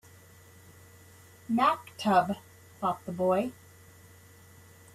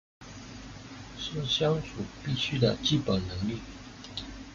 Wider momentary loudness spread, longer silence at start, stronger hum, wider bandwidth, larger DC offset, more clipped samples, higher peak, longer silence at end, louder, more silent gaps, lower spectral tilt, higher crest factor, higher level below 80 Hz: second, 11 LU vs 18 LU; first, 1.5 s vs 0.2 s; neither; first, 15.5 kHz vs 7.6 kHz; neither; neither; about the same, -12 dBFS vs -12 dBFS; first, 1.4 s vs 0 s; about the same, -29 LUFS vs -30 LUFS; neither; about the same, -6 dB/octave vs -5.5 dB/octave; about the same, 20 dB vs 20 dB; second, -70 dBFS vs -52 dBFS